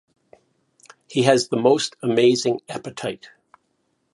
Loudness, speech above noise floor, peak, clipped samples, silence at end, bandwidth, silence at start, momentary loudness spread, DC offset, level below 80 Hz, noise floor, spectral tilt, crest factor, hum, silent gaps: -20 LUFS; 50 dB; 0 dBFS; under 0.1%; 0.85 s; 11.5 kHz; 1.1 s; 13 LU; under 0.1%; -68 dBFS; -70 dBFS; -4.5 dB/octave; 22 dB; none; none